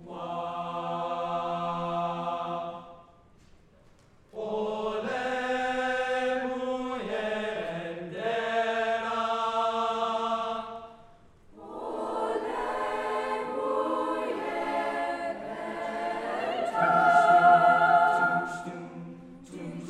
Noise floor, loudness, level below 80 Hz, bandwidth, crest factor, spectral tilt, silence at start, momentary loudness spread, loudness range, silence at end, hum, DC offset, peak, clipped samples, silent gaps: -58 dBFS; -28 LUFS; -62 dBFS; 11.5 kHz; 20 dB; -5 dB/octave; 0 s; 16 LU; 11 LU; 0 s; none; under 0.1%; -8 dBFS; under 0.1%; none